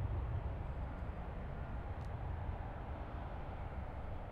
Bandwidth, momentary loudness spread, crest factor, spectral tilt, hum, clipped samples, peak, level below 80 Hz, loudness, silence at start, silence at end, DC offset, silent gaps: 5.2 kHz; 4 LU; 14 dB; -9 dB/octave; none; under 0.1%; -30 dBFS; -46 dBFS; -45 LUFS; 0 s; 0 s; under 0.1%; none